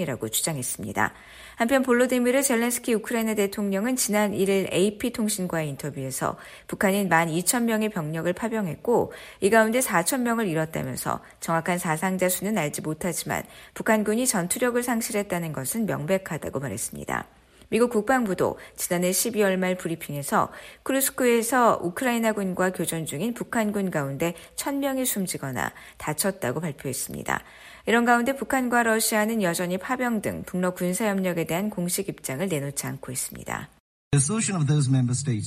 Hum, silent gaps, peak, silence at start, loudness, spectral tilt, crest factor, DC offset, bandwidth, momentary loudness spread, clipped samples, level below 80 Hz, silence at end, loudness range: none; 33.80-34.11 s; -6 dBFS; 0 s; -25 LUFS; -4.5 dB/octave; 20 dB; under 0.1%; 15.5 kHz; 9 LU; under 0.1%; -56 dBFS; 0 s; 4 LU